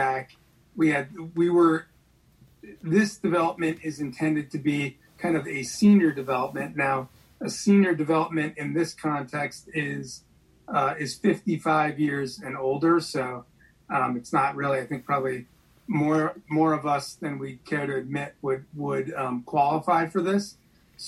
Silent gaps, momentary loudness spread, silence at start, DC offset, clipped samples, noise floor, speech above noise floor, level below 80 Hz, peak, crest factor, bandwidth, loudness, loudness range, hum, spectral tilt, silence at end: none; 12 LU; 0 s; under 0.1%; under 0.1%; -60 dBFS; 35 dB; -64 dBFS; -8 dBFS; 18 dB; 12.5 kHz; -26 LUFS; 4 LU; none; -6 dB/octave; 0 s